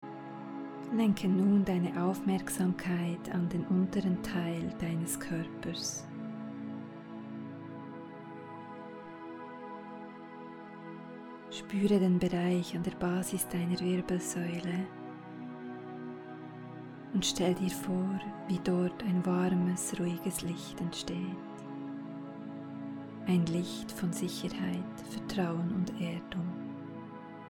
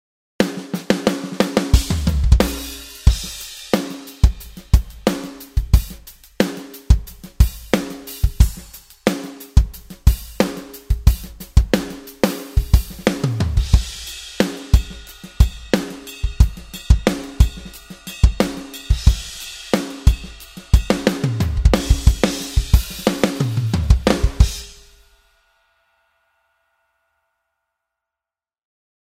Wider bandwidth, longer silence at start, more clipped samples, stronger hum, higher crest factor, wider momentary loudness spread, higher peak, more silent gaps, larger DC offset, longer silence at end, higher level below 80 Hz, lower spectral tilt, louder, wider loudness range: about the same, 17.5 kHz vs 16 kHz; second, 0 s vs 0.4 s; neither; neither; about the same, 18 dB vs 18 dB; first, 16 LU vs 13 LU; second, -16 dBFS vs 0 dBFS; neither; neither; second, 0.05 s vs 4.45 s; second, -62 dBFS vs -20 dBFS; about the same, -5.5 dB/octave vs -5.5 dB/octave; second, -34 LUFS vs -20 LUFS; first, 13 LU vs 3 LU